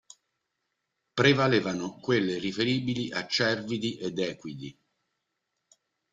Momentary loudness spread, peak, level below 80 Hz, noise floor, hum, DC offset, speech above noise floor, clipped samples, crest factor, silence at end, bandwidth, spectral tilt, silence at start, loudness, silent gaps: 14 LU; -6 dBFS; -66 dBFS; -82 dBFS; none; under 0.1%; 54 dB; under 0.1%; 22 dB; 1.4 s; 9.2 kHz; -5 dB/octave; 1.15 s; -27 LUFS; none